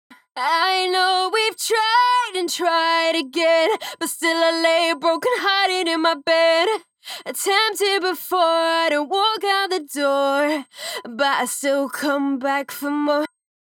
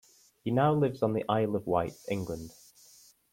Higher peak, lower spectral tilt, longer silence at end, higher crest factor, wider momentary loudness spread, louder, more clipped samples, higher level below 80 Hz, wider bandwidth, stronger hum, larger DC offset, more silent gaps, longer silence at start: first, -4 dBFS vs -12 dBFS; second, -0.5 dB/octave vs -7.5 dB/octave; second, 0.35 s vs 0.8 s; about the same, 16 dB vs 18 dB; second, 8 LU vs 13 LU; first, -19 LUFS vs -30 LUFS; neither; second, -88 dBFS vs -62 dBFS; first, 19 kHz vs 16.5 kHz; neither; neither; neither; about the same, 0.35 s vs 0.45 s